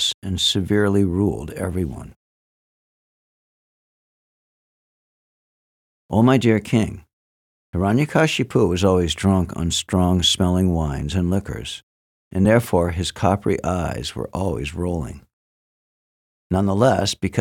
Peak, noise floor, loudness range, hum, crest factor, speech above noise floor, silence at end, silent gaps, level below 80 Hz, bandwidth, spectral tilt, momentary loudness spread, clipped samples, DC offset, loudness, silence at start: -4 dBFS; under -90 dBFS; 8 LU; none; 18 dB; over 71 dB; 0 s; 0.14-0.22 s, 2.16-6.09 s, 7.13-7.73 s, 11.83-12.31 s, 15.33-16.50 s; -40 dBFS; 16.5 kHz; -5.5 dB/octave; 11 LU; under 0.1%; under 0.1%; -20 LUFS; 0 s